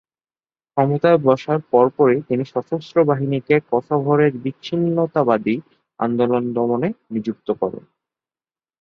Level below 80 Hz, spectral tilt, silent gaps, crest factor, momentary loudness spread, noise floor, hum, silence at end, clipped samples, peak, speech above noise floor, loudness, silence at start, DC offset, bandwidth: -62 dBFS; -9 dB/octave; none; 18 dB; 10 LU; under -90 dBFS; none; 1.05 s; under 0.1%; -2 dBFS; over 72 dB; -19 LUFS; 0.75 s; under 0.1%; 6.6 kHz